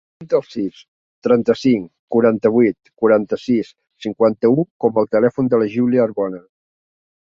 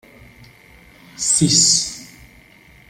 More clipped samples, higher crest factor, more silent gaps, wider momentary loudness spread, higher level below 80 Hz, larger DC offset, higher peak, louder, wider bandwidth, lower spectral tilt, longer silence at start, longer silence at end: neither; about the same, 16 dB vs 20 dB; first, 0.88-1.22 s, 1.99-2.08 s, 4.70-4.80 s vs none; second, 11 LU vs 15 LU; second, -58 dBFS vs -52 dBFS; neither; about the same, -2 dBFS vs 0 dBFS; second, -17 LUFS vs -14 LUFS; second, 7.2 kHz vs 16 kHz; first, -8 dB/octave vs -2 dB/octave; second, 0.2 s vs 1.2 s; about the same, 0.9 s vs 0.85 s